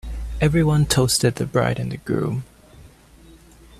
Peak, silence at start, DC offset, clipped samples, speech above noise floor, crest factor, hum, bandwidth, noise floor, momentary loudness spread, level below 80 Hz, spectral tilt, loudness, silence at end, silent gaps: -4 dBFS; 0.05 s; under 0.1%; under 0.1%; 29 dB; 18 dB; none; 15 kHz; -48 dBFS; 10 LU; -36 dBFS; -5 dB/octave; -20 LUFS; 0.45 s; none